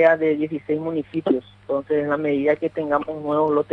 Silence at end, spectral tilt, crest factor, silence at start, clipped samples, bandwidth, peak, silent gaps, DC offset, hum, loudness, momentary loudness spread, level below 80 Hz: 0 s; -8.5 dB/octave; 16 dB; 0 s; under 0.1%; 4.7 kHz; -6 dBFS; none; under 0.1%; none; -22 LUFS; 5 LU; -60 dBFS